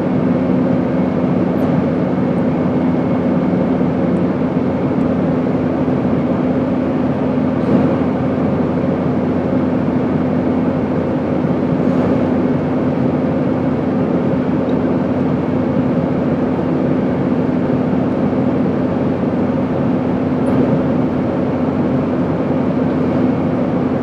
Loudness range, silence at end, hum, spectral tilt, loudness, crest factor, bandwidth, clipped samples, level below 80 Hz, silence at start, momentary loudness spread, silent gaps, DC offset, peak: 1 LU; 0 s; none; -10 dB/octave; -16 LUFS; 14 dB; 6 kHz; under 0.1%; -44 dBFS; 0 s; 2 LU; none; under 0.1%; 0 dBFS